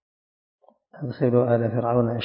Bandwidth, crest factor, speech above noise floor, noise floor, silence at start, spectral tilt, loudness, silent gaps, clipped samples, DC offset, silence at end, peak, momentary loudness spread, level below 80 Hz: 5.4 kHz; 18 dB; over 68 dB; under -90 dBFS; 0.95 s; -12.5 dB/octave; -22 LUFS; none; under 0.1%; under 0.1%; 0 s; -6 dBFS; 14 LU; -58 dBFS